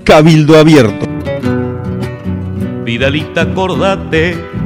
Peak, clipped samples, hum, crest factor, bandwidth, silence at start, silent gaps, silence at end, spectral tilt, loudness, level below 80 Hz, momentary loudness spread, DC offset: 0 dBFS; 4%; none; 10 dB; 14 kHz; 0 s; none; 0 s; -6.5 dB/octave; -11 LUFS; -32 dBFS; 14 LU; under 0.1%